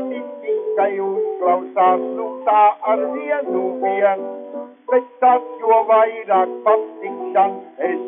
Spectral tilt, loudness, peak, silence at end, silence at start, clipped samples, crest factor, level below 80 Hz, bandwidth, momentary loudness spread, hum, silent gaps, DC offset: -3 dB/octave; -18 LUFS; -4 dBFS; 0 s; 0 s; under 0.1%; 14 dB; under -90 dBFS; 3.7 kHz; 12 LU; none; none; under 0.1%